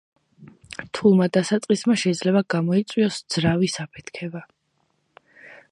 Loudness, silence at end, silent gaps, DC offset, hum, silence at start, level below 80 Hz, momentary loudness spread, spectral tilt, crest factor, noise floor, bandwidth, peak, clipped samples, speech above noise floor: -21 LUFS; 0.15 s; none; under 0.1%; none; 0.4 s; -60 dBFS; 16 LU; -5.5 dB/octave; 18 dB; -70 dBFS; 11.5 kHz; -6 dBFS; under 0.1%; 49 dB